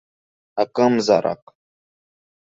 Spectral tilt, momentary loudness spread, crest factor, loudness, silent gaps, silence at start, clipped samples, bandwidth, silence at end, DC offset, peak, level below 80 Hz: -5.5 dB/octave; 14 LU; 20 dB; -19 LUFS; none; 0.55 s; under 0.1%; 8 kHz; 1.1 s; under 0.1%; -2 dBFS; -66 dBFS